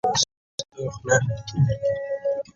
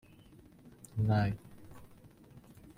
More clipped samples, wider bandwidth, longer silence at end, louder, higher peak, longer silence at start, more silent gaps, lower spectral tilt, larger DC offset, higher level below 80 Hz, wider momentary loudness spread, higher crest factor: neither; second, 8.8 kHz vs 12.5 kHz; second, 0.15 s vs 0.4 s; first, -25 LUFS vs -34 LUFS; first, -6 dBFS vs -20 dBFS; second, 0.05 s vs 0.65 s; first, 0.37-0.58 s vs none; second, -4 dB/octave vs -8 dB/octave; neither; first, -48 dBFS vs -58 dBFS; second, 11 LU vs 27 LU; about the same, 18 dB vs 18 dB